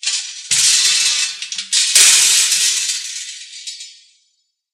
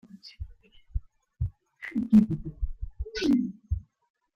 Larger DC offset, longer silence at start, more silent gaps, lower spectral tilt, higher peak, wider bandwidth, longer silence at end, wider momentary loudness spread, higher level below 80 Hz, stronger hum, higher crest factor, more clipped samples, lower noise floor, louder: neither; about the same, 0.05 s vs 0.15 s; neither; second, 4.5 dB/octave vs -7.5 dB/octave; first, 0 dBFS vs -10 dBFS; first, 16 kHz vs 6.8 kHz; first, 0.8 s vs 0.55 s; about the same, 21 LU vs 22 LU; second, -68 dBFS vs -40 dBFS; neither; about the same, 16 dB vs 20 dB; neither; first, -66 dBFS vs -53 dBFS; first, -11 LUFS vs -28 LUFS